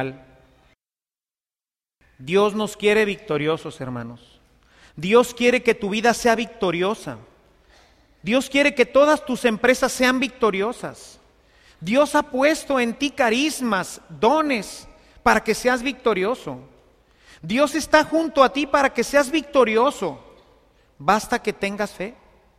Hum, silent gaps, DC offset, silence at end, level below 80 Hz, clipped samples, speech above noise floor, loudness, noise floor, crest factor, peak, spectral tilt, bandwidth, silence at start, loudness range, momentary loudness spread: none; none; under 0.1%; 0.45 s; -52 dBFS; under 0.1%; over 70 dB; -20 LUFS; under -90 dBFS; 22 dB; 0 dBFS; -4 dB/octave; 15.5 kHz; 0 s; 4 LU; 15 LU